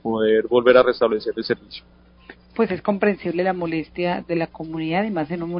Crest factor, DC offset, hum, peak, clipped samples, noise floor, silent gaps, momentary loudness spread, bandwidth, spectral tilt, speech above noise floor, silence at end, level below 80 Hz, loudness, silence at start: 20 dB; under 0.1%; none; 0 dBFS; under 0.1%; -47 dBFS; none; 13 LU; 5.4 kHz; -11 dB/octave; 26 dB; 0 s; -54 dBFS; -21 LUFS; 0.05 s